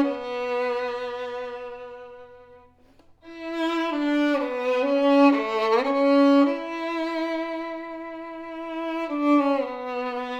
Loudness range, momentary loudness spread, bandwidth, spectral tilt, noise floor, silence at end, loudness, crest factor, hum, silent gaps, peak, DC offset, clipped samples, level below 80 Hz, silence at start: 11 LU; 17 LU; 8 kHz; -4.5 dB/octave; -55 dBFS; 0 s; -24 LUFS; 18 dB; none; none; -6 dBFS; under 0.1%; under 0.1%; -64 dBFS; 0 s